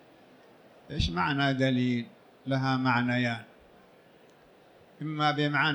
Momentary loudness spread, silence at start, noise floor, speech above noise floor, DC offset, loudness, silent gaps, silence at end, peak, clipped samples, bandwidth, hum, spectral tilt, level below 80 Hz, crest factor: 14 LU; 0.9 s; -57 dBFS; 30 dB; under 0.1%; -28 LUFS; none; 0 s; -14 dBFS; under 0.1%; 18.5 kHz; none; -6.5 dB/octave; -50 dBFS; 18 dB